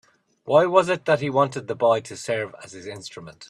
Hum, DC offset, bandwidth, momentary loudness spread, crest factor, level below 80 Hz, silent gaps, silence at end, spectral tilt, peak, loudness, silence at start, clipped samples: none; under 0.1%; 11.5 kHz; 19 LU; 20 dB; -66 dBFS; none; 0.05 s; -5 dB/octave; -4 dBFS; -21 LUFS; 0.45 s; under 0.1%